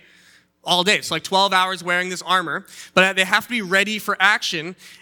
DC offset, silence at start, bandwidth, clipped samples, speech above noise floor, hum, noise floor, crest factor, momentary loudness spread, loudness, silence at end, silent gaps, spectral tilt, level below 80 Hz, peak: under 0.1%; 0.65 s; 19.5 kHz; under 0.1%; 34 dB; none; -54 dBFS; 20 dB; 10 LU; -18 LUFS; 0.1 s; none; -2.5 dB/octave; -70 dBFS; 0 dBFS